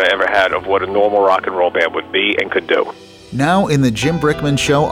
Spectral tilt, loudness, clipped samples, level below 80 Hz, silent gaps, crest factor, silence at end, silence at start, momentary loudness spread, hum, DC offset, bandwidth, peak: -5 dB/octave; -15 LUFS; under 0.1%; -42 dBFS; none; 12 dB; 0 s; 0 s; 4 LU; none; under 0.1%; 16 kHz; -2 dBFS